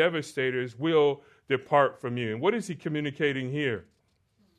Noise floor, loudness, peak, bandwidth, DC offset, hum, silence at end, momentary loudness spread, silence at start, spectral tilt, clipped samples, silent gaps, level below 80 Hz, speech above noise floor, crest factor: -69 dBFS; -28 LUFS; -8 dBFS; 12.5 kHz; under 0.1%; none; 0.75 s; 9 LU; 0 s; -6 dB/octave; under 0.1%; none; -72 dBFS; 42 dB; 20 dB